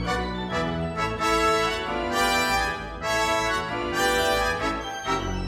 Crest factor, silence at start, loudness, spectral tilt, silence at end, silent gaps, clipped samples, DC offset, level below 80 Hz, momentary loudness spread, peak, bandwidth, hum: 16 dB; 0 s; -24 LUFS; -3.5 dB/octave; 0 s; none; under 0.1%; under 0.1%; -40 dBFS; 6 LU; -10 dBFS; 18 kHz; none